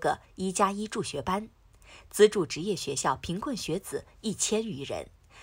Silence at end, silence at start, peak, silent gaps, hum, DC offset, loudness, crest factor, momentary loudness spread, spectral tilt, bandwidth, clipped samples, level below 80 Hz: 0 s; 0 s; -8 dBFS; none; none; under 0.1%; -30 LUFS; 22 dB; 14 LU; -4 dB/octave; 16 kHz; under 0.1%; -56 dBFS